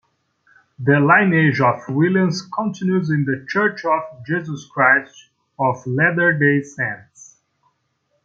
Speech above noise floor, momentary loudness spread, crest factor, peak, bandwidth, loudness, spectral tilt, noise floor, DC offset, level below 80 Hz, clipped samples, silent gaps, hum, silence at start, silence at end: 51 dB; 11 LU; 18 dB; -2 dBFS; 7.6 kHz; -18 LUFS; -7 dB/octave; -69 dBFS; under 0.1%; -64 dBFS; under 0.1%; none; none; 0.8 s; 1.3 s